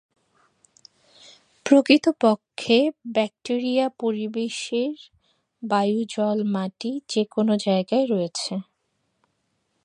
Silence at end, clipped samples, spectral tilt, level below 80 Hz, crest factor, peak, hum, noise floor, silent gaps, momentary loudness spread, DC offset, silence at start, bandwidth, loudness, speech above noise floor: 1.2 s; under 0.1%; -5 dB/octave; -74 dBFS; 22 dB; -2 dBFS; none; -73 dBFS; none; 10 LU; under 0.1%; 1.65 s; 10.5 kHz; -23 LUFS; 51 dB